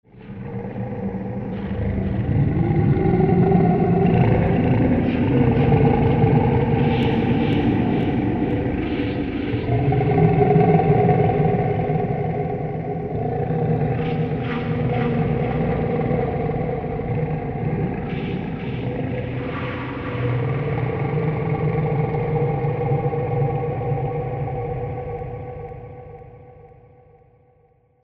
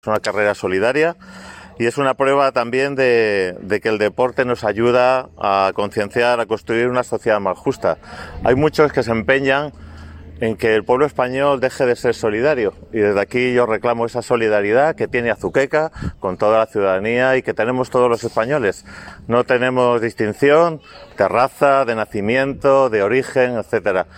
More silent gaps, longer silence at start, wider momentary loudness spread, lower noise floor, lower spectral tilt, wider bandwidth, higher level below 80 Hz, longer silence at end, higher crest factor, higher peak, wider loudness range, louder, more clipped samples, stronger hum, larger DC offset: neither; about the same, 0.15 s vs 0.05 s; first, 11 LU vs 7 LU; first, -58 dBFS vs -36 dBFS; first, -11 dB/octave vs -6 dB/octave; second, 4.9 kHz vs 15.5 kHz; first, -36 dBFS vs -48 dBFS; first, 1.35 s vs 0.15 s; about the same, 18 dB vs 16 dB; about the same, -2 dBFS vs -2 dBFS; first, 8 LU vs 2 LU; second, -21 LUFS vs -17 LUFS; neither; neither; neither